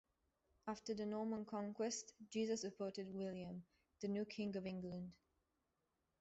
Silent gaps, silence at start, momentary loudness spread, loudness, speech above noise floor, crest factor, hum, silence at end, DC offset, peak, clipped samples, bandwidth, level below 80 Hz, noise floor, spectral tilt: none; 0.65 s; 8 LU; -47 LUFS; 42 dB; 16 dB; none; 1.05 s; under 0.1%; -32 dBFS; under 0.1%; 8 kHz; -80 dBFS; -88 dBFS; -5.5 dB/octave